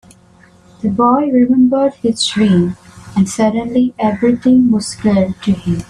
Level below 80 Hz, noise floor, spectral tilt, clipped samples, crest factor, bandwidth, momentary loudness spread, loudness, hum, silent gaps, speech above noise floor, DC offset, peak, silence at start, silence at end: -46 dBFS; -46 dBFS; -6 dB/octave; under 0.1%; 12 dB; 11.5 kHz; 7 LU; -14 LUFS; none; none; 33 dB; under 0.1%; 0 dBFS; 0.85 s; 0.05 s